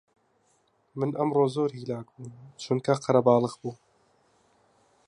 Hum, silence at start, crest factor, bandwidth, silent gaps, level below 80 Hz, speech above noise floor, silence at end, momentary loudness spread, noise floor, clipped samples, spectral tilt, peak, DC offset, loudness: none; 0.95 s; 22 dB; 11 kHz; none; -72 dBFS; 42 dB; 1.35 s; 22 LU; -68 dBFS; under 0.1%; -7 dB/octave; -8 dBFS; under 0.1%; -26 LUFS